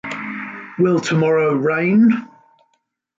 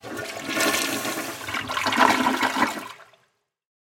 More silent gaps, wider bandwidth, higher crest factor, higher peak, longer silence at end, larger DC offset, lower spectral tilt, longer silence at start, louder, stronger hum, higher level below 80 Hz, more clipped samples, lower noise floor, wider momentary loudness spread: neither; second, 7.8 kHz vs 17 kHz; second, 12 dB vs 24 dB; second, -6 dBFS vs -2 dBFS; about the same, 0.9 s vs 0.95 s; neither; first, -7 dB/octave vs -2 dB/octave; about the same, 0.05 s vs 0.05 s; first, -17 LUFS vs -23 LUFS; neither; about the same, -62 dBFS vs -60 dBFS; neither; about the same, -68 dBFS vs -69 dBFS; about the same, 14 LU vs 13 LU